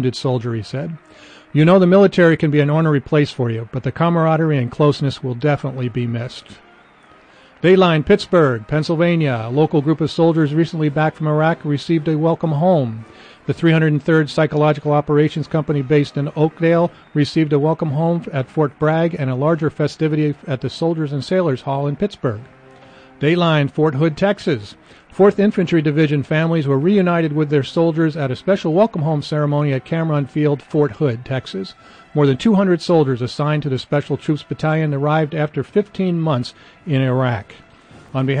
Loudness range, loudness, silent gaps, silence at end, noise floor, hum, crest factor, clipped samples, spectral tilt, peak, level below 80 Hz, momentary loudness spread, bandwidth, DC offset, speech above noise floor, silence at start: 4 LU; -17 LUFS; none; 0 s; -48 dBFS; none; 16 dB; under 0.1%; -8 dB/octave; -2 dBFS; -52 dBFS; 8 LU; 9.2 kHz; under 0.1%; 31 dB; 0 s